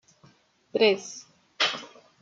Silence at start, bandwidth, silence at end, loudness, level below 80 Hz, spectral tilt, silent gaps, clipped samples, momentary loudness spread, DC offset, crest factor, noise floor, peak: 0.75 s; 7.8 kHz; 0.35 s; -26 LUFS; -80 dBFS; -2.5 dB/octave; none; under 0.1%; 18 LU; under 0.1%; 22 dB; -60 dBFS; -8 dBFS